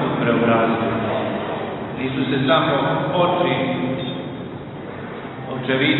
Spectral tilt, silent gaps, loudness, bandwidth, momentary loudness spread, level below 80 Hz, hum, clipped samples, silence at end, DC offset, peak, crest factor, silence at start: -4 dB/octave; none; -20 LUFS; 4.2 kHz; 14 LU; -52 dBFS; none; under 0.1%; 0 s; under 0.1%; -2 dBFS; 18 dB; 0 s